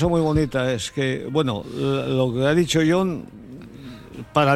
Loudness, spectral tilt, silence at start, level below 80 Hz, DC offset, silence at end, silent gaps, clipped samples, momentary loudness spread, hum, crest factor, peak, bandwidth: -22 LUFS; -6 dB/octave; 0 s; -44 dBFS; under 0.1%; 0 s; none; under 0.1%; 21 LU; none; 16 dB; -4 dBFS; 14 kHz